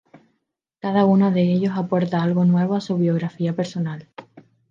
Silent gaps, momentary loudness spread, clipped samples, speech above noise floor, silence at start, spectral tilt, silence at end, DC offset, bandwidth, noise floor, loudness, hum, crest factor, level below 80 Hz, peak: none; 10 LU; under 0.1%; 56 dB; 0.85 s; -8.5 dB/octave; 0.3 s; under 0.1%; 7.2 kHz; -76 dBFS; -20 LUFS; none; 16 dB; -68 dBFS; -4 dBFS